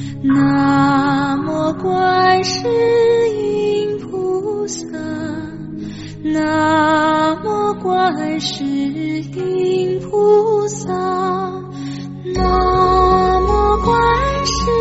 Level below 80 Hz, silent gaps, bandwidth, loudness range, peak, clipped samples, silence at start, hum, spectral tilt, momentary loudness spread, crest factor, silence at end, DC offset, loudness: -32 dBFS; none; 8 kHz; 4 LU; -2 dBFS; under 0.1%; 0 s; none; -4.5 dB/octave; 12 LU; 14 dB; 0 s; under 0.1%; -16 LUFS